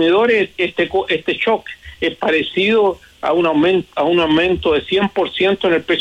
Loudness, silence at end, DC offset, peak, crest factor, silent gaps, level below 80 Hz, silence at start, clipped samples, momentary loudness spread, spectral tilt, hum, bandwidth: -16 LUFS; 0 s; under 0.1%; -4 dBFS; 12 dB; none; -46 dBFS; 0 s; under 0.1%; 5 LU; -6 dB/octave; none; 8.8 kHz